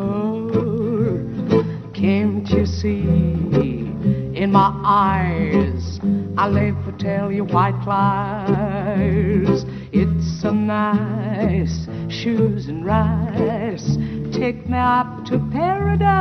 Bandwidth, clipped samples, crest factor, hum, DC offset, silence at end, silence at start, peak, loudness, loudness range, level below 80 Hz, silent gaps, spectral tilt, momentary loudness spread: 6.4 kHz; under 0.1%; 16 dB; none; under 0.1%; 0 s; 0 s; -2 dBFS; -20 LUFS; 2 LU; -40 dBFS; none; -8 dB/octave; 6 LU